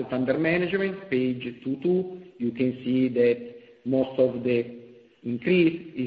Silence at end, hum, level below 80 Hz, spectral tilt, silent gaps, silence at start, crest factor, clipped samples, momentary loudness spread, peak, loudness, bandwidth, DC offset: 0 s; none; -64 dBFS; -10 dB/octave; none; 0 s; 16 dB; under 0.1%; 11 LU; -10 dBFS; -25 LUFS; 5 kHz; under 0.1%